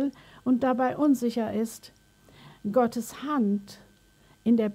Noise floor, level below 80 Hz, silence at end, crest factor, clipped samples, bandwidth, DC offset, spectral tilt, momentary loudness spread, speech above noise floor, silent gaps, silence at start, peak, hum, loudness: -59 dBFS; -66 dBFS; 0 s; 16 dB; under 0.1%; 16 kHz; under 0.1%; -6.5 dB/octave; 10 LU; 34 dB; none; 0 s; -12 dBFS; none; -27 LUFS